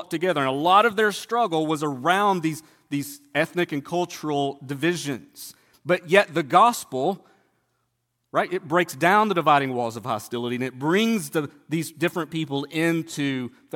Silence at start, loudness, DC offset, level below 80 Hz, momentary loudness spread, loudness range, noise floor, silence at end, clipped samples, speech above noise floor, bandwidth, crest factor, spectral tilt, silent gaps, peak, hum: 0 s; -23 LUFS; under 0.1%; -72 dBFS; 12 LU; 4 LU; -75 dBFS; 0.25 s; under 0.1%; 52 dB; 17.5 kHz; 22 dB; -5 dB/octave; none; -2 dBFS; none